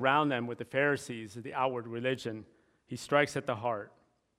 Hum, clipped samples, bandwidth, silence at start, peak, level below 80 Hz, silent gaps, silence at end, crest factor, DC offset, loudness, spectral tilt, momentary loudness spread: none; under 0.1%; 15 kHz; 0 s; -10 dBFS; -74 dBFS; none; 0.5 s; 22 dB; under 0.1%; -32 LUFS; -5 dB/octave; 14 LU